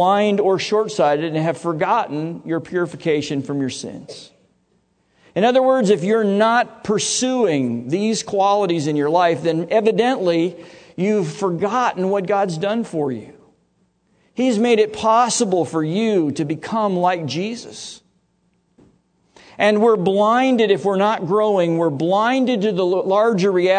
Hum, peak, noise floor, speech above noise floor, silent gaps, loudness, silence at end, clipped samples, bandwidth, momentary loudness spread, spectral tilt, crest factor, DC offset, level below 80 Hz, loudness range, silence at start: none; -2 dBFS; -64 dBFS; 46 dB; none; -18 LUFS; 0 s; under 0.1%; 9.4 kHz; 9 LU; -5 dB/octave; 16 dB; under 0.1%; -66 dBFS; 5 LU; 0 s